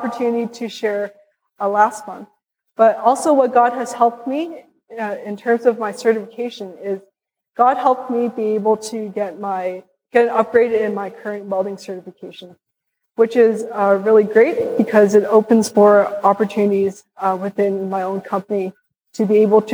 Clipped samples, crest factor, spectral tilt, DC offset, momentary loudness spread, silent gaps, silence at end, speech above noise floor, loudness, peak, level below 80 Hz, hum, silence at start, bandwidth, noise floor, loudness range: under 0.1%; 16 dB; -6 dB/octave; under 0.1%; 16 LU; none; 0 s; 59 dB; -17 LUFS; -2 dBFS; -70 dBFS; none; 0 s; over 20 kHz; -76 dBFS; 6 LU